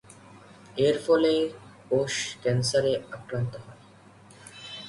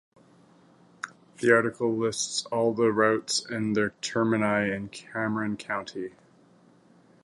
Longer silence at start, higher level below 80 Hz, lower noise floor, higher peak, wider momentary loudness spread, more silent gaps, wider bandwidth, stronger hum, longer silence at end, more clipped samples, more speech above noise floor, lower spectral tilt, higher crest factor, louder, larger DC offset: second, 0.1 s vs 1.05 s; about the same, -62 dBFS vs -66 dBFS; second, -53 dBFS vs -58 dBFS; second, -10 dBFS vs -6 dBFS; first, 20 LU vs 16 LU; neither; about the same, 11.5 kHz vs 11.5 kHz; neither; second, 0 s vs 1.15 s; neither; second, 27 dB vs 32 dB; about the same, -5 dB/octave vs -4 dB/octave; about the same, 18 dB vs 22 dB; about the same, -26 LUFS vs -26 LUFS; neither